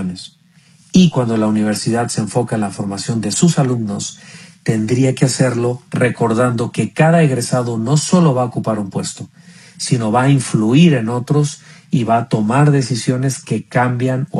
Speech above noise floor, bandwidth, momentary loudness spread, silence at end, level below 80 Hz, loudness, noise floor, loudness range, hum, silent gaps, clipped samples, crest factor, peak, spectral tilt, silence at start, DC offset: 34 dB; 12.5 kHz; 10 LU; 0 s; -52 dBFS; -16 LUFS; -49 dBFS; 3 LU; none; none; under 0.1%; 16 dB; 0 dBFS; -6 dB/octave; 0 s; under 0.1%